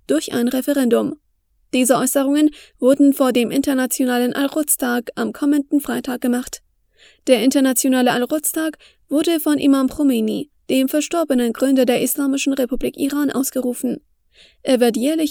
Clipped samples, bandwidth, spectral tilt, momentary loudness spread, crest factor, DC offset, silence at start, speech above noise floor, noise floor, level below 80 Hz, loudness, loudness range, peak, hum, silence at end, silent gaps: under 0.1%; over 20 kHz; -3.5 dB/octave; 8 LU; 18 dB; under 0.1%; 0.1 s; 45 dB; -62 dBFS; -50 dBFS; -18 LUFS; 3 LU; 0 dBFS; none; 0 s; none